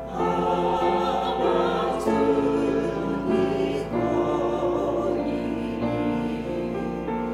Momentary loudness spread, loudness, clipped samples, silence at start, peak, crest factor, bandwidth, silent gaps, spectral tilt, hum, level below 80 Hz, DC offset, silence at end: 6 LU; -25 LUFS; under 0.1%; 0 s; -8 dBFS; 16 dB; 13 kHz; none; -7 dB/octave; none; -44 dBFS; under 0.1%; 0 s